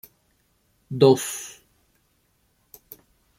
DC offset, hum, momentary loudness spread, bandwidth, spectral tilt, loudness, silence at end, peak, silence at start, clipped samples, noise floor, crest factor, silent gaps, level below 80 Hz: under 0.1%; none; 27 LU; 16.5 kHz; -5.5 dB/octave; -21 LUFS; 1.9 s; -2 dBFS; 0.9 s; under 0.1%; -67 dBFS; 24 dB; none; -66 dBFS